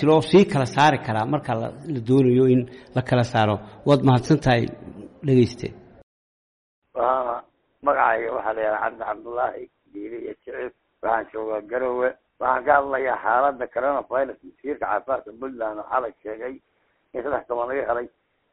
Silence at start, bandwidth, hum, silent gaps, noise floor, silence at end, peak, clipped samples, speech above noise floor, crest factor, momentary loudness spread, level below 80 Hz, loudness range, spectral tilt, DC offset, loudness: 0 s; 11 kHz; none; 6.03-6.82 s; under -90 dBFS; 0.45 s; -4 dBFS; under 0.1%; over 68 dB; 18 dB; 16 LU; -52 dBFS; 8 LU; -7 dB/octave; under 0.1%; -22 LUFS